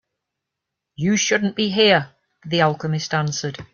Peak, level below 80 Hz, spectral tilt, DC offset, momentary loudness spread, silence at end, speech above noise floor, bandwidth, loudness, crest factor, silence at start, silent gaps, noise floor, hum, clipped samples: -4 dBFS; -60 dBFS; -4 dB/octave; under 0.1%; 9 LU; 0.1 s; 63 dB; 7.2 kHz; -19 LUFS; 18 dB; 1 s; none; -82 dBFS; none; under 0.1%